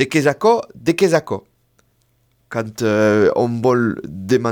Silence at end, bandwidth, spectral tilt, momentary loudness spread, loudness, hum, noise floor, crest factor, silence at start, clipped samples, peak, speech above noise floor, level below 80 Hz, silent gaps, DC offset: 0 s; 18.5 kHz; -6 dB/octave; 12 LU; -17 LUFS; none; -61 dBFS; 16 dB; 0 s; under 0.1%; -2 dBFS; 45 dB; -58 dBFS; none; under 0.1%